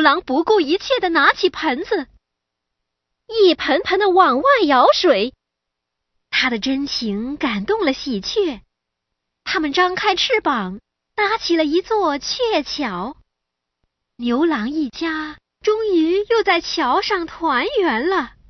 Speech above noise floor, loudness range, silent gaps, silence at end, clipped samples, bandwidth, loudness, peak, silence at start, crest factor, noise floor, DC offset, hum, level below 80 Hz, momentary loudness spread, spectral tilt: 63 dB; 6 LU; none; 0.2 s; under 0.1%; 6.4 kHz; -18 LUFS; 0 dBFS; 0 s; 18 dB; -80 dBFS; under 0.1%; none; -52 dBFS; 10 LU; -4 dB/octave